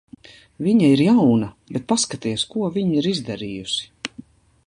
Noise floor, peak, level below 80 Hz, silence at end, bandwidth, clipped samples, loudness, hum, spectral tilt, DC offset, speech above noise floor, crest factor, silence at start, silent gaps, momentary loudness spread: -45 dBFS; -4 dBFS; -56 dBFS; 0.45 s; 11.5 kHz; under 0.1%; -20 LUFS; none; -5 dB/octave; under 0.1%; 25 dB; 16 dB; 0.6 s; none; 15 LU